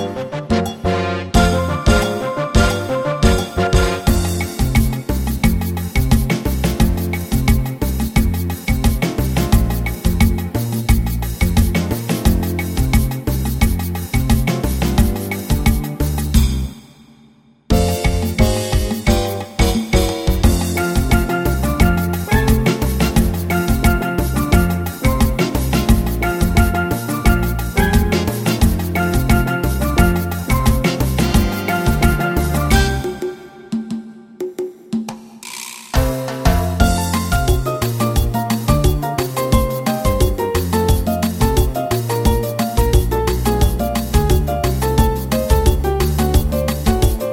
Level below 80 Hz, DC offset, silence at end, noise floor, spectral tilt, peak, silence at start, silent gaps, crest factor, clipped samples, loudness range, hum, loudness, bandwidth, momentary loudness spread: -20 dBFS; under 0.1%; 0 s; -49 dBFS; -5.5 dB/octave; 0 dBFS; 0 s; none; 16 dB; under 0.1%; 3 LU; none; -17 LUFS; 16.5 kHz; 5 LU